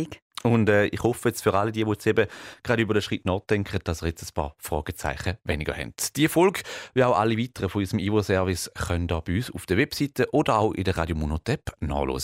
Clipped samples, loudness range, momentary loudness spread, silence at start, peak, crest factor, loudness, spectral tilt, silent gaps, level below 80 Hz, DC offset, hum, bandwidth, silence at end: under 0.1%; 3 LU; 9 LU; 0 s; -8 dBFS; 18 dB; -25 LUFS; -5.5 dB/octave; 0.22-0.30 s; -42 dBFS; under 0.1%; none; 16 kHz; 0 s